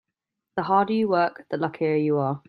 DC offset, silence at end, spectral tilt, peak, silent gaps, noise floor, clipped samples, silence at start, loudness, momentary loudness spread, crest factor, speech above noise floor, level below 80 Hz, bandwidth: under 0.1%; 0.1 s; -9.5 dB/octave; -6 dBFS; none; -84 dBFS; under 0.1%; 0.55 s; -24 LUFS; 8 LU; 18 dB; 61 dB; -70 dBFS; 5.2 kHz